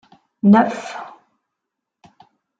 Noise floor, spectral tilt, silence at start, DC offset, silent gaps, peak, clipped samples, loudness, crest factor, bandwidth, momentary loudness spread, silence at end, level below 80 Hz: -81 dBFS; -7.5 dB/octave; 0.45 s; under 0.1%; none; -2 dBFS; under 0.1%; -16 LUFS; 18 dB; 7.6 kHz; 21 LU; 1.55 s; -66 dBFS